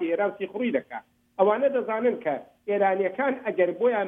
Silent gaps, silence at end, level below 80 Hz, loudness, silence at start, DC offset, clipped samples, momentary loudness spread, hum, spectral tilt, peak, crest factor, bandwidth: none; 0 s; -76 dBFS; -26 LUFS; 0 s; under 0.1%; under 0.1%; 9 LU; none; -8.5 dB/octave; -8 dBFS; 18 dB; 3.8 kHz